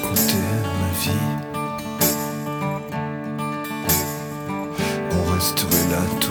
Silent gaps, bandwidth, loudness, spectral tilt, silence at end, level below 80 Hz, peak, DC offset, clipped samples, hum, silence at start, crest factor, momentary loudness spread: none; over 20 kHz; -22 LUFS; -4 dB/octave; 0 s; -44 dBFS; -4 dBFS; under 0.1%; under 0.1%; none; 0 s; 20 dB; 9 LU